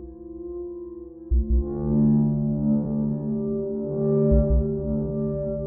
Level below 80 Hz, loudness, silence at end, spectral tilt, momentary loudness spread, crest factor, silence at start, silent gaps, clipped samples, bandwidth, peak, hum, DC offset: -30 dBFS; -24 LUFS; 0 s; -14 dB/octave; 16 LU; 16 dB; 0 s; none; under 0.1%; 1.9 kHz; -8 dBFS; none; under 0.1%